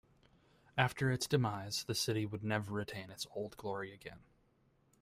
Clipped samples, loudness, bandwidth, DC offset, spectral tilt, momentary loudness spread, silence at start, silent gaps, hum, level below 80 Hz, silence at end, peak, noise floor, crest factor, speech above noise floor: under 0.1%; -38 LUFS; 16 kHz; under 0.1%; -4.5 dB/octave; 11 LU; 0.75 s; none; none; -68 dBFS; 0.85 s; -16 dBFS; -73 dBFS; 24 dB; 35 dB